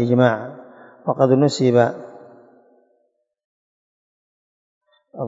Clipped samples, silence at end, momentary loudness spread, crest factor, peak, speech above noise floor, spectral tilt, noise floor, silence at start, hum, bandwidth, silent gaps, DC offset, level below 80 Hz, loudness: under 0.1%; 0 s; 20 LU; 20 dB; 0 dBFS; 51 dB; -7 dB/octave; -68 dBFS; 0 s; none; 8 kHz; 3.44-4.81 s; under 0.1%; -72 dBFS; -18 LUFS